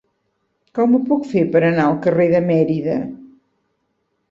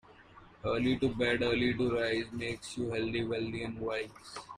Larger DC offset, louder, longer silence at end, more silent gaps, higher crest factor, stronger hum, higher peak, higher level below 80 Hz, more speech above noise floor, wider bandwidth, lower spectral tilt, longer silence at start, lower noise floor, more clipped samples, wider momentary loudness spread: neither; first, -17 LUFS vs -33 LUFS; first, 1.05 s vs 0 s; neither; about the same, 16 dB vs 16 dB; neither; first, -2 dBFS vs -18 dBFS; about the same, -58 dBFS vs -56 dBFS; first, 54 dB vs 24 dB; second, 7.4 kHz vs 11 kHz; first, -9 dB/octave vs -5.5 dB/octave; first, 0.75 s vs 0.1 s; first, -69 dBFS vs -56 dBFS; neither; about the same, 8 LU vs 8 LU